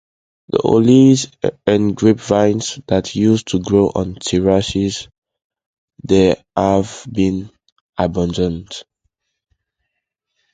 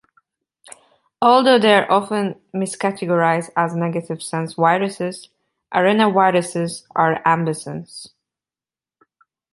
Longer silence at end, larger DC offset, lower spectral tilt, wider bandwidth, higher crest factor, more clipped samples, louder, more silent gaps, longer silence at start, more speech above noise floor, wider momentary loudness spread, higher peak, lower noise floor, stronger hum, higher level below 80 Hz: first, 1.7 s vs 1.45 s; neither; about the same, -6 dB/octave vs -5 dB/octave; second, 9.4 kHz vs 11.5 kHz; about the same, 16 dB vs 18 dB; neither; about the same, -16 LUFS vs -18 LUFS; first, 5.18-5.22 s, 5.44-5.50 s, 5.66-5.88 s, 7.72-7.93 s vs none; second, 0.55 s vs 1.2 s; second, 61 dB vs over 72 dB; second, 11 LU vs 14 LU; about the same, 0 dBFS vs -2 dBFS; second, -76 dBFS vs under -90 dBFS; neither; first, -40 dBFS vs -66 dBFS